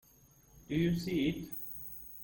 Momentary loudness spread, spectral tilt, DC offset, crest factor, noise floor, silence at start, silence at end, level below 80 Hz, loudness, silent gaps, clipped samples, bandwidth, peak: 10 LU; -6.5 dB/octave; under 0.1%; 16 dB; -63 dBFS; 0.55 s; 0 s; -56 dBFS; -36 LUFS; none; under 0.1%; 17 kHz; -22 dBFS